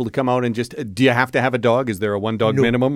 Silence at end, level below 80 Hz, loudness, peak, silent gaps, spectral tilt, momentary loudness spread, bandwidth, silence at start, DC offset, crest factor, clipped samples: 0 s; -50 dBFS; -19 LUFS; 0 dBFS; none; -6.5 dB/octave; 6 LU; 15 kHz; 0 s; under 0.1%; 18 dB; under 0.1%